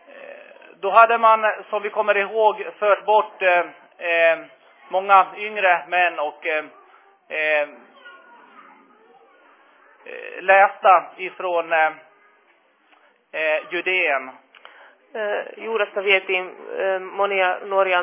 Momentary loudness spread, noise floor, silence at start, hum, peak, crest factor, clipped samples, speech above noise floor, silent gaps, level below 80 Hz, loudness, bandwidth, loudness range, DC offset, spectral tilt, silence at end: 15 LU; -59 dBFS; 0.15 s; none; 0 dBFS; 20 dB; under 0.1%; 40 dB; none; -86 dBFS; -19 LUFS; 3.9 kHz; 7 LU; under 0.1%; -6 dB/octave; 0 s